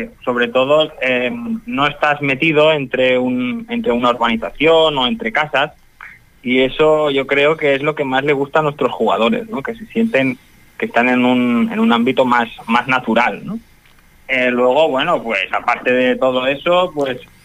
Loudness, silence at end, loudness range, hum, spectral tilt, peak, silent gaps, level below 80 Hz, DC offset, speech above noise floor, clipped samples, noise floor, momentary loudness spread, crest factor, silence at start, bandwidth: -15 LUFS; 0.2 s; 2 LU; none; -6 dB/octave; -2 dBFS; none; -48 dBFS; under 0.1%; 32 dB; under 0.1%; -47 dBFS; 8 LU; 14 dB; 0 s; 14.5 kHz